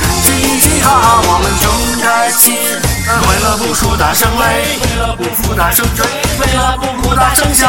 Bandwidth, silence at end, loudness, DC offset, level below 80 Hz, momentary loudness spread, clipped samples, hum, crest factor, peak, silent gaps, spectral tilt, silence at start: over 20 kHz; 0 s; -10 LUFS; 2%; -20 dBFS; 6 LU; 0.3%; none; 10 dB; 0 dBFS; none; -3 dB/octave; 0 s